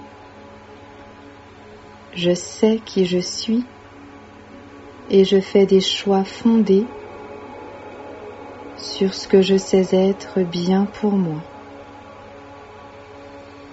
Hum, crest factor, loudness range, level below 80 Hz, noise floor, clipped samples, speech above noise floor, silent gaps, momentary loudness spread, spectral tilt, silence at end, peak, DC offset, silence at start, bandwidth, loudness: none; 18 dB; 5 LU; -56 dBFS; -42 dBFS; under 0.1%; 25 dB; none; 25 LU; -5.5 dB/octave; 0 s; -2 dBFS; under 0.1%; 0 s; 8 kHz; -18 LUFS